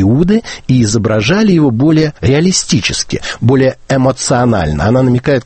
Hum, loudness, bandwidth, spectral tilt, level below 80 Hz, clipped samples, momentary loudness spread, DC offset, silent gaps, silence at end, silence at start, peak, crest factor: none; -11 LUFS; 8.8 kHz; -5.5 dB/octave; -32 dBFS; under 0.1%; 4 LU; under 0.1%; none; 0.05 s; 0 s; 0 dBFS; 10 dB